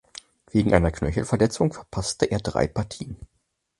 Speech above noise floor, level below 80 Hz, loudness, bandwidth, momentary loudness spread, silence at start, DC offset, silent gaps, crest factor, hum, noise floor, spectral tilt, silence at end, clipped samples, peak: 24 dB; -38 dBFS; -24 LUFS; 11.5 kHz; 17 LU; 0.55 s; under 0.1%; none; 24 dB; none; -47 dBFS; -6 dB/octave; 0.55 s; under 0.1%; -2 dBFS